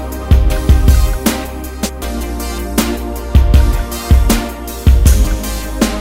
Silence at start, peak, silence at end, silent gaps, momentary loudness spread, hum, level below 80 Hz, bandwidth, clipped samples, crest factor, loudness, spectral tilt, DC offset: 0 s; 0 dBFS; 0 s; none; 11 LU; none; -14 dBFS; 16.5 kHz; 0.2%; 12 dB; -14 LUFS; -5.5 dB/octave; under 0.1%